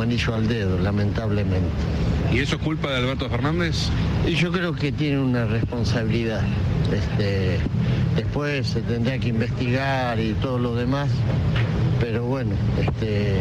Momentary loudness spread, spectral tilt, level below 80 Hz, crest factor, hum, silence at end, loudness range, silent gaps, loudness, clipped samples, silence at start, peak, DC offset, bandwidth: 2 LU; -7 dB/octave; -32 dBFS; 10 dB; none; 0 s; 0 LU; none; -23 LUFS; under 0.1%; 0 s; -12 dBFS; under 0.1%; 9.6 kHz